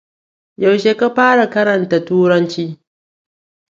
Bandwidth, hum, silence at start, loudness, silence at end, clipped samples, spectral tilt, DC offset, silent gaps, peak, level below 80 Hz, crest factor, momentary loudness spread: 7.6 kHz; none; 0.6 s; -14 LUFS; 0.95 s; under 0.1%; -6.5 dB/octave; under 0.1%; none; 0 dBFS; -64 dBFS; 16 dB; 8 LU